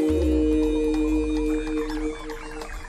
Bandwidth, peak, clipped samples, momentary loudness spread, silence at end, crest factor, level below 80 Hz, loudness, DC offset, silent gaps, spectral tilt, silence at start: 12.5 kHz; -12 dBFS; under 0.1%; 14 LU; 0 s; 12 dB; -32 dBFS; -24 LUFS; under 0.1%; none; -7 dB/octave; 0 s